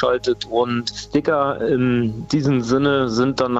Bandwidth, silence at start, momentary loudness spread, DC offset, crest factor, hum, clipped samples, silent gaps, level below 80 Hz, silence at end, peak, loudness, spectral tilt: 8.2 kHz; 0 s; 4 LU; under 0.1%; 16 dB; none; under 0.1%; none; -46 dBFS; 0 s; -2 dBFS; -19 LUFS; -6 dB/octave